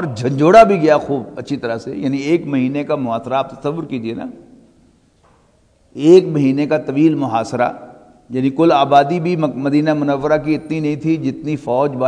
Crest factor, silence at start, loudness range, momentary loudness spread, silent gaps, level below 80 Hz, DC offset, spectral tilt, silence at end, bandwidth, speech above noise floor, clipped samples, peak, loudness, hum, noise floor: 16 dB; 0 s; 6 LU; 13 LU; none; -52 dBFS; under 0.1%; -7.5 dB/octave; 0 s; 10.5 kHz; 39 dB; 0.3%; 0 dBFS; -16 LUFS; none; -54 dBFS